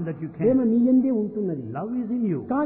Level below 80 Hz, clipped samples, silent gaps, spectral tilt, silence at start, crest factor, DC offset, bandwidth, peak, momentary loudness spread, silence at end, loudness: -60 dBFS; under 0.1%; none; -13.5 dB/octave; 0 s; 14 dB; under 0.1%; 2.9 kHz; -10 dBFS; 10 LU; 0 s; -23 LUFS